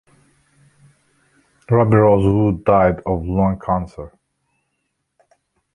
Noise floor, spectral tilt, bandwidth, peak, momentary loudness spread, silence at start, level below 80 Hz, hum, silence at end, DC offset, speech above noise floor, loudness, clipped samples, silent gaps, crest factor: -73 dBFS; -10 dB/octave; 9.8 kHz; -2 dBFS; 14 LU; 1.7 s; -38 dBFS; none; 1.65 s; under 0.1%; 57 dB; -16 LUFS; under 0.1%; none; 18 dB